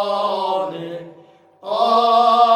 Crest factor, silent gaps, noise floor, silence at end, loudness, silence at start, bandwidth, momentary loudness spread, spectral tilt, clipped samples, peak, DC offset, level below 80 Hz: 16 dB; none; -48 dBFS; 0 s; -17 LUFS; 0 s; 10 kHz; 19 LU; -4.5 dB/octave; under 0.1%; -2 dBFS; under 0.1%; -76 dBFS